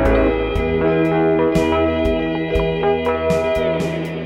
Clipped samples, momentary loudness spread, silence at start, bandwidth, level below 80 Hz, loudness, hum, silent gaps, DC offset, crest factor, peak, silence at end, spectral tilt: under 0.1%; 4 LU; 0 s; 14 kHz; -28 dBFS; -18 LUFS; none; none; under 0.1%; 14 dB; -4 dBFS; 0 s; -7 dB/octave